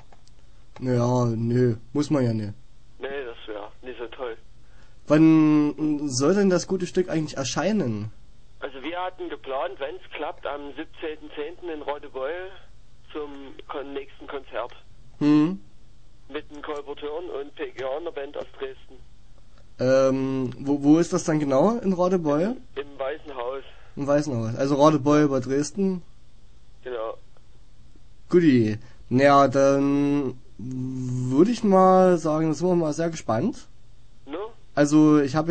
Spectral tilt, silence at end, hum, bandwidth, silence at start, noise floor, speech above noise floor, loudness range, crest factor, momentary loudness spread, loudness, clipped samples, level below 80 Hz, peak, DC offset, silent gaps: -6.5 dB/octave; 0 s; none; 9.2 kHz; 0.8 s; -52 dBFS; 29 dB; 13 LU; 20 dB; 19 LU; -23 LUFS; under 0.1%; -52 dBFS; -4 dBFS; 0.9%; none